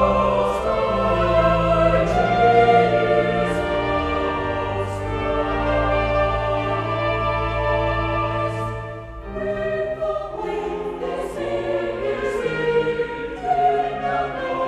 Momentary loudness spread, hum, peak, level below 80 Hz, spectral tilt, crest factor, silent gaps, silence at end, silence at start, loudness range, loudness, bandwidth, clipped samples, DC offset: 10 LU; none; -4 dBFS; -34 dBFS; -7 dB/octave; 16 dB; none; 0 s; 0 s; 8 LU; -21 LUFS; 12 kHz; under 0.1%; under 0.1%